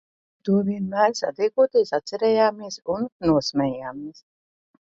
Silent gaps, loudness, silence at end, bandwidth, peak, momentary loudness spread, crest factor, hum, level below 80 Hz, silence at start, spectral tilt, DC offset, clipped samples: 3.12-3.20 s; -23 LUFS; 0.75 s; 7.8 kHz; -6 dBFS; 13 LU; 18 dB; none; -56 dBFS; 0.45 s; -5.5 dB/octave; under 0.1%; under 0.1%